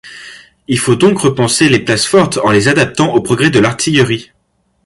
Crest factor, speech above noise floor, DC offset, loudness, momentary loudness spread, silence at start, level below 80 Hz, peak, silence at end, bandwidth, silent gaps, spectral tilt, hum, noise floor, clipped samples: 12 dB; 24 dB; under 0.1%; -11 LUFS; 6 LU; 0.05 s; -44 dBFS; 0 dBFS; 0.65 s; 11.5 kHz; none; -4.5 dB/octave; none; -35 dBFS; under 0.1%